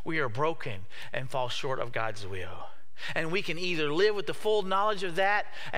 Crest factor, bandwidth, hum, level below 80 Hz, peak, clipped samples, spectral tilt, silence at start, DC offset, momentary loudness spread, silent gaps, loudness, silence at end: 18 dB; 15.5 kHz; none; -64 dBFS; -12 dBFS; under 0.1%; -4.5 dB/octave; 0.05 s; 3%; 13 LU; none; -30 LUFS; 0 s